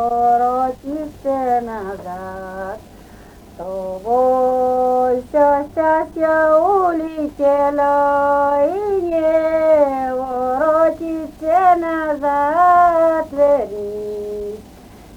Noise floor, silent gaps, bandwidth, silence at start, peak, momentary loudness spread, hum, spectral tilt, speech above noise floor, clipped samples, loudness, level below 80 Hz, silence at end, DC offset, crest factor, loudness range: -41 dBFS; none; 19.5 kHz; 0 s; -2 dBFS; 14 LU; none; -6.5 dB/octave; 24 dB; under 0.1%; -16 LUFS; -46 dBFS; 0 s; under 0.1%; 14 dB; 6 LU